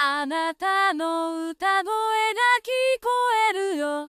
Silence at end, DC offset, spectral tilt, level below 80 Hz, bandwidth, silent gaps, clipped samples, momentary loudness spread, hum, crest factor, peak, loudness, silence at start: 0.05 s; under 0.1%; 0 dB/octave; -70 dBFS; 15.5 kHz; none; under 0.1%; 6 LU; none; 16 dB; -8 dBFS; -23 LUFS; 0 s